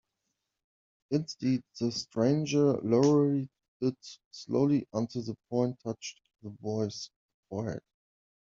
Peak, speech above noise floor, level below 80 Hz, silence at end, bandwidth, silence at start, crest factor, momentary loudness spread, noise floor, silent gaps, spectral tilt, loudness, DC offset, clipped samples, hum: -12 dBFS; 54 dB; -70 dBFS; 0.65 s; 7.6 kHz; 1.1 s; 20 dB; 18 LU; -84 dBFS; 3.68-3.80 s, 4.25-4.31 s, 7.16-7.43 s; -7 dB/octave; -30 LUFS; under 0.1%; under 0.1%; none